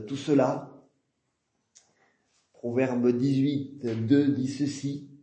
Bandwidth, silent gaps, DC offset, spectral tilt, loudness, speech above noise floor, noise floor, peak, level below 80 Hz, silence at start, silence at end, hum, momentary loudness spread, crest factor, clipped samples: 8.6 kHz; none; under 0.1%; -7 dB/octave; -27 LUFS; 52 dB; -78 dBFS; -10 dBFS; -74 dBFS; 0 s; 0.05 s; none; 11 LU; 18 dB; under 0.1%